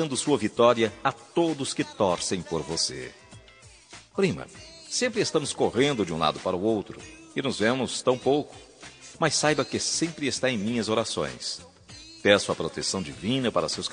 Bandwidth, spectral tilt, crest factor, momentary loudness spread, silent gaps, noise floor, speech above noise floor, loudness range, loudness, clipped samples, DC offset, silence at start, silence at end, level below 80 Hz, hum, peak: 10 kHz; -3.5 dB/octave; 24 dB; 18 LU; none; -52 dBFS; 26 dB; 3 LU; -26 LUFS; under 0.1%; under 0.1%; 0 s; 0 s; -60 dBFS; none; -2 dBFS